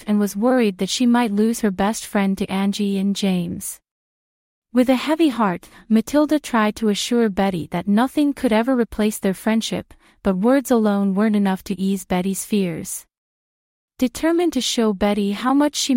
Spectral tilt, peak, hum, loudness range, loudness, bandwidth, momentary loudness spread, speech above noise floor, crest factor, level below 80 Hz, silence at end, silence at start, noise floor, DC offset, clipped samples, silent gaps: -5 dB/octave; -4 dBFS; none; 3 LU; -20 LUFS; 16.5 kHz; 7 LU; over 71 dB; 16 dB; -50 dBFS; 0 s; 0 s; under -90 dBFS; under 0.1%; under 0.1%; 3.91-4.62 s, 13.18-13.88 s